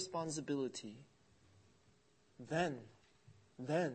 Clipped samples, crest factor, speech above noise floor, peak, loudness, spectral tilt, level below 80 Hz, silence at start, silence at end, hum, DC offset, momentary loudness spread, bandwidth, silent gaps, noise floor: under 0.1%; 20 dB; 32 dB; -24 dBFS; -42 LUFS; -5 dB/octave; -76 dBFS; 0 s; 0 s; none; under 0.1%; 21 LU; 8.4 kHz; none; -72 dBFS